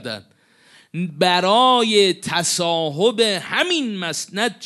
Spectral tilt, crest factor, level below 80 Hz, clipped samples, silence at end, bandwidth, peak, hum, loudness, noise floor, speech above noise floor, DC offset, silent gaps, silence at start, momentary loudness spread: -3 dB/octave; 18 dB; -66 dBFS; under 0.1%; 0 s; 12 kHz; -2 dBFS; none; -18 LUFS; -52 dBFS; 34 dB; under 0.1%; none; 0 s; 14 LU